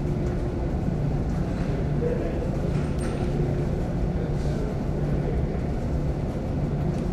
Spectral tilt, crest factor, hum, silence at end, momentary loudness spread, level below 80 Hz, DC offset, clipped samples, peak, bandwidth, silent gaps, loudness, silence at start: -8.5 dB/octave; 12 dB; none; 0 s; 2 LU; -30 dBFS; under 0.1%; under 0.1%; -12 dBFS; 10 kHz; none; -27 LUFS; 0 s